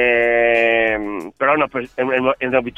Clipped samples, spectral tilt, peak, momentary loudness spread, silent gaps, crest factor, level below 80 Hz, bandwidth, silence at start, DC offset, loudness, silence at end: under 0.1%; -6 dB/octave; -2 dBFS; 8 LU; none; 16 dB; -48 dBFS; 7.8 kHz; 0 s; under 0.1%; -17 LUFS; 0.05 s